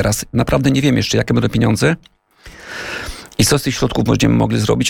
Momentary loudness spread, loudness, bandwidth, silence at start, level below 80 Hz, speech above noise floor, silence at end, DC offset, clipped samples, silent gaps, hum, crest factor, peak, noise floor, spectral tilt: 12 LU; -16 LUFS; 17.5 kHz; 0 s; -34 dBFS; 25 dB; 0 s; under 0.1%; under 0.1%; none; none; 14 dB; -2 dBFS; -40 dBFS; -5 dB/octave